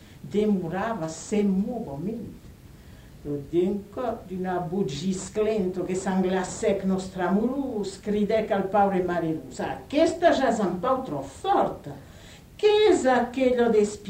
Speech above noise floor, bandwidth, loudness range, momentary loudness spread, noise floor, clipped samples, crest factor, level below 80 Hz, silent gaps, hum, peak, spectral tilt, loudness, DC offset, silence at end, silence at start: 22 dB; 16 kHz; 6 LU; 12 LU; -47 dBFS; under 0.1%; 16 dB; -52 dBFS; none; none; -8 dBFS; -6 dB/octave; -25 LUFS; under 0.1%; 0 s; 0 s